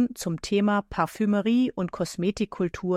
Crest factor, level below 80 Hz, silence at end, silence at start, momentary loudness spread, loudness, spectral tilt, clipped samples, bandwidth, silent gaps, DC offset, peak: 16 dB; -52 dBFS; 0 s; 0 s; 7 LU; -26 LUFS; -6 dB/octave; under 0.1%; 15 kHz; none; under 0.1%; -10 dBFS